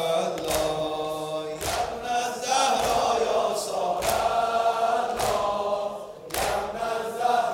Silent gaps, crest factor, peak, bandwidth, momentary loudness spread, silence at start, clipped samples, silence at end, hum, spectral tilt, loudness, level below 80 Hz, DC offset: none; 22 dB; -4 dBFS; 16.5 kHz; 7 LU; 0 s; under 0.1%; 0 s; none; -2.5 dB/octave; -26 LUFS; -50 dBFS; under 0.1%